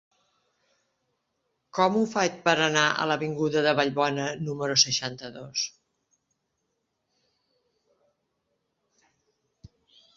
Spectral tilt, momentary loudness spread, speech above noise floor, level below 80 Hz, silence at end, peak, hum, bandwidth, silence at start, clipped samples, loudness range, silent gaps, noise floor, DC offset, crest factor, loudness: -3 dB/octave; 11 LU; 53 dB; -68 dBFS; 4.5 s; -6 dBFS; none; 7.8 kHz; 1.75 s; under 0.1%; 14 LU; none; -78 dBFS; under 0.1%; 24 dB; -25 LUFS